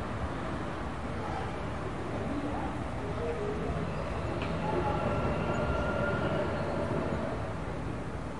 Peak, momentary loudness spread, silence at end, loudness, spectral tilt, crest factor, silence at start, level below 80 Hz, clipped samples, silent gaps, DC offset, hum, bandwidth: -18 dBFS; 6 LU; 0 s; -34 LUFS; -7 dB/octave; 16 dB; 0 s; -44 dBFS; under 0.1%; none; 0.6%; none; 11.5 kHz